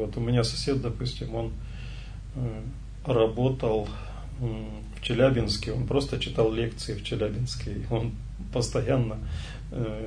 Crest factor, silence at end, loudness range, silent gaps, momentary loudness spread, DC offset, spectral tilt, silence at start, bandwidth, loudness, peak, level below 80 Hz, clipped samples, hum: 18 dB; 0 s; 3 LU; none; 14 LU; under 0.1%; -6 dB/octave; 0 s; 10.5 kHz; -29 LUFS; -10 dBFS; -38 dBFS; under 0.1%; none